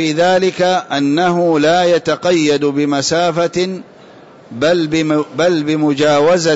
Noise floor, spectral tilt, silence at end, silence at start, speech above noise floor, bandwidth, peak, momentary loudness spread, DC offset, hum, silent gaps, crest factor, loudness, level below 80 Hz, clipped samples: -40 dBFS; -5 dB/octave; 0 s; 0 s; 26 dB; 8 kHz; -4 dBFS; 5 LU; under 0.1%; none; none; 10 dB; -14 LUFS; -54 dBFS; under 0.1%